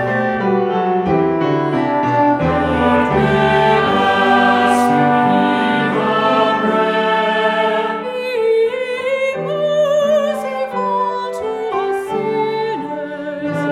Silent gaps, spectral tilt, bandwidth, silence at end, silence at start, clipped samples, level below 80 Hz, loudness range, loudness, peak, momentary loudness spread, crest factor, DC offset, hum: none; -6 dB/octave; 15 kHz; 0 s; 0 s; under 0.1%; -44 dBFS; 5 LU; -16 LUFS; -2 dBFS; 8 LU; 14 dB; under 0.1%; none